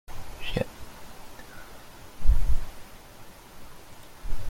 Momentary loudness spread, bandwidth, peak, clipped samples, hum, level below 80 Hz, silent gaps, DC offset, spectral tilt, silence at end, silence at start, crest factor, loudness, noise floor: 19 LU; 14.5 kHz; -8 dBFS; under 0.1%; none; -30 dBFS; none; under 0.1%; -5.5 dB/octave; 0 s; 0.1 s; 18 dB; -35 LUFS; -46 dBFS